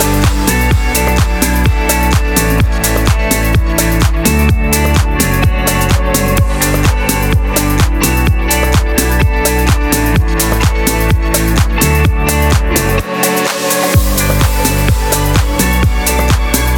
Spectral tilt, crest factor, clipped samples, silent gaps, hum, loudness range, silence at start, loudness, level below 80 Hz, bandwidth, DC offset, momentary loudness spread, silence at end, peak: -4.5 dB/octave; 10 dB; under 0.1%; none; none; 0 LU; 0 s; -12 LUFS; -14 dBFS; 20 kHz; under 0.1%; 2 LU; 0 s; 0 dBFS